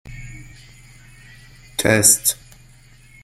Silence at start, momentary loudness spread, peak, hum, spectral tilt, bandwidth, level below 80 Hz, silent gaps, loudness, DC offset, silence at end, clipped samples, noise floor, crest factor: 0.05 s; 25 LU; 0 dBFS; none; -2.5 dB/octave; 16.5 kHz; -46 dBFS; none; -15 LUFS; under 0.1%; 0.9 s; under 0.1%; -47 dBFS; 22 dB